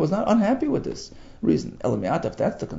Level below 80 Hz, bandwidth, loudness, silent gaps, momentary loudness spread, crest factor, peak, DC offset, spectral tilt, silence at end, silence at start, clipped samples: -48 dBFS; 7.8 kHz; -24 LUFS; none; 11 LU; 16 dB; -8 dBFS; under 0.1%; -7 dB/octave; 0 s; 0 s; under 0.1%